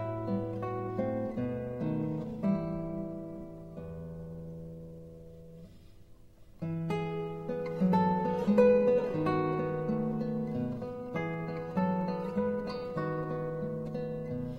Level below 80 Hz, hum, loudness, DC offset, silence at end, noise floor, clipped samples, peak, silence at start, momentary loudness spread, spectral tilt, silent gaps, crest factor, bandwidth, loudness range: -56 dBFS; none; -32 LUFS; under 0.1%; 0 s; -54 dBFS; under 0.1%; -12 dBFS; 0 s; 17 LU; -9.5 dB/octave; none; 20 dB; 8.4 kHz; 14 LU